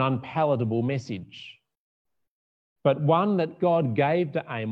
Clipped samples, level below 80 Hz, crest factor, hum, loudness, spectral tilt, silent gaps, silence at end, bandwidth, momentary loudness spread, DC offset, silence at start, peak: under 0.1%; -74 dBFS; 18 dB; none; -25 LUFS; -8.5 dB/octave; 1.77-2.05 s, 2.28-2.76 s; 0 s; 7.6 kHz; 14 LU; under 0.1%; 0 s; -8 dBFS